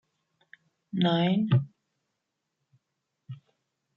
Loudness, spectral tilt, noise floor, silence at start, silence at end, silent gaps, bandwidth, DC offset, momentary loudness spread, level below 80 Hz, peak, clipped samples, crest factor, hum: -26 LUFS; -9 dB/octave; -83 dBFS; 0.95 s; 0.6 s; none; 5.8 kHz; under 0.1%; 23 LU; -70 dBFS; -12 dBFS; under 0.1%; 18 dB; none